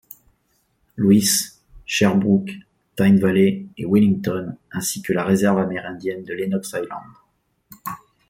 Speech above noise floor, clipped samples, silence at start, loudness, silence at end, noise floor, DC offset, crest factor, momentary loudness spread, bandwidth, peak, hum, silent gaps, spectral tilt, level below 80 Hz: 47 dB; under 0.1%; 0.95 s; -20 LUFS; 0.35 s; -66 dBFS; under 0.1%; 18 dB; 18 LU; 16.5 kHz; -4 dBFS; none; none; -5 dB/octave; -56 dBFS